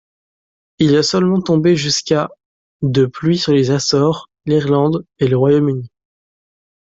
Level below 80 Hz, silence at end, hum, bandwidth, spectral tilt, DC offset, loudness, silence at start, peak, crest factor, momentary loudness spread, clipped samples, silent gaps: -52 dBFS; 1 s; none; 7.8 kHz; -5.5 dB/octave; under 0.1%; -15 LUFS; 0.8 s; -2 dBFS; 14 dB; 5 LU; under 0.1%; 2.45-2.80 s